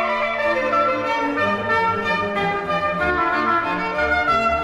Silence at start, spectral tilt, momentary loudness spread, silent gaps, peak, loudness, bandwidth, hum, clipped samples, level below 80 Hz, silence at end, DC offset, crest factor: 0 s; -5.5 dB/octave; 3 LU; none; -8 dBFS; -20 LUFS; 13.5 kHz; none; under 0.1%; -44 dBFS; 0 s; under 0.1%; 12 dB